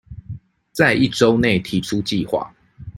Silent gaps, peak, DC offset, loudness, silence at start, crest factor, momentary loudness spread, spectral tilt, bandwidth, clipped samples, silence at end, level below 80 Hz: none; -2 dBFS; under 0.1%; -18 LUFS; 0.1 s; 18 dB; 20 LU; -5.5 dB/octave; 16.5 kHz; under 0.1%; 0 s; -46 dBFS